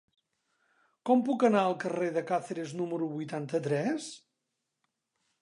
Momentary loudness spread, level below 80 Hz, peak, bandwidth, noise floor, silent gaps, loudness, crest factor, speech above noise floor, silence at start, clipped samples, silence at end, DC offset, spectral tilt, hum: 12 LU; -86 dBFS; -12 dBFS; 11 kHz; -84 dBFS; none; -30 LUFS; 20 dB; 55 dB; 1.05 s; under 0.1%; 1.25 s; under 0.1%; -6 dB/octave; none